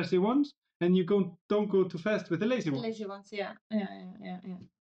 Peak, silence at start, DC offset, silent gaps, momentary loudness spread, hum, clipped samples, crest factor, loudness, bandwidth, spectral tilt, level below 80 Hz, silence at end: -18 dBFS; 0 s; under 0.1%; 0.57-0.62 s, 0.75-0.80 s, 1.41-1.49 s, 3.61-3.70 s; 16 LU; none; under 0.1%; 14 dB; -31 LUFS; 7.8 kHz; -7.5 dB/octave; -74 dBFS; 0.3 s